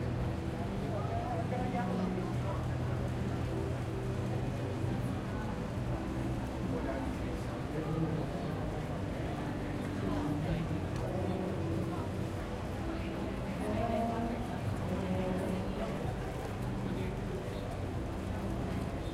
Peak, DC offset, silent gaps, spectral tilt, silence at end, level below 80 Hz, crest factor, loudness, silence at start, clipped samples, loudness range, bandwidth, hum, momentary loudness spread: -22 dBFS; under 0.1%; none; -7.5 dB/octave; 0 s; -46 dBFS; 14 dB; -36 LUFS; 0 s; under 0.1%; 1 LU; 15 kHz; none; 4 LU